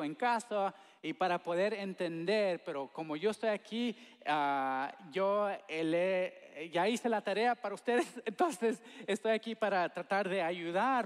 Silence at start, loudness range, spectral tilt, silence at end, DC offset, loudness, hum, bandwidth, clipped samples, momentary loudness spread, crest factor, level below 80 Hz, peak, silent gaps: 0 s; 2 LU; -5 dB/octave; 0 s; under 0.1%; -35 LUFS; none; 14 kHz; under 0.1%; 7 LU; 16 dB; under -90 dBFS; -20 dBFS; none